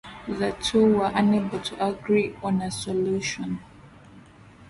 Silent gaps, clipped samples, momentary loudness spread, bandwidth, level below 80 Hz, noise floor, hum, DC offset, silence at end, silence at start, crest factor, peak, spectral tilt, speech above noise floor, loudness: none; under 0.1%; 11 LU; 11.5 kHz; -54 dBFS; -49 dBFS; none; under 0.1%; 0.05 s; 0.05 s; 16 dB; -10 dBFS; -5.5 dB/octave; 25 dB; -25 LUFS